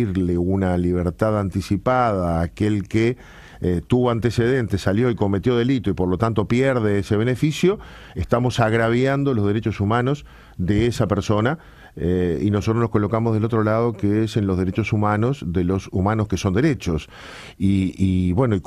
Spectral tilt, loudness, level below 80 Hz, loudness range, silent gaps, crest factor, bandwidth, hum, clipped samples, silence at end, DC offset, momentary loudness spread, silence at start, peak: -7.5 dB/octave; -21 LUFS; -40 dBFS; 2 LU; none; 18 dB; 13 kHz; none; under 0.1%; 0.05 s; under 0.1%; 5 LU; 0 s; -2 dBFS